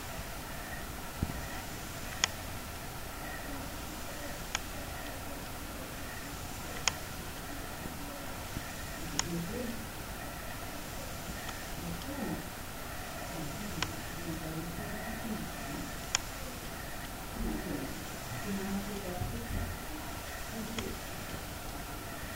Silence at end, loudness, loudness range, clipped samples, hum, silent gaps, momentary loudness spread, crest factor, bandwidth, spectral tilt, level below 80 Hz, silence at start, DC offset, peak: 0 s; -39 LUFS; 2 LU; under 0.1%; none; none; 7 LU; 32 dB; 16 kHz; -3.5 dB/octave; -48 dBFS; 0 s; under 0.1%; -8 dBFS